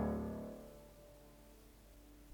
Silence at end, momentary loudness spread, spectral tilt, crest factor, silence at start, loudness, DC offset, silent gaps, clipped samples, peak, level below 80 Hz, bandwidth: 0 s; 19 LU; -7.5 dB/octave; 20 dB; 0 s; -47 LUFS; under 0.1%; none; under 0.1%; -26 dBFS; -58 dBFS; over 20 kHz